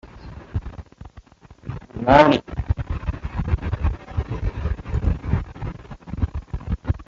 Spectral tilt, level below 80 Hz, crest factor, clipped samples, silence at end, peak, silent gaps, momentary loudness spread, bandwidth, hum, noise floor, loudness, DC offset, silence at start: -8 dB/octave; -30 dBFS; 22 dB; under 0.1%; 0.05 s; -2 dBFS; none; 22 LU; 7.4 kHz; none; -46 dBFS; -23 LUFS; under 0.1%; 0.05 s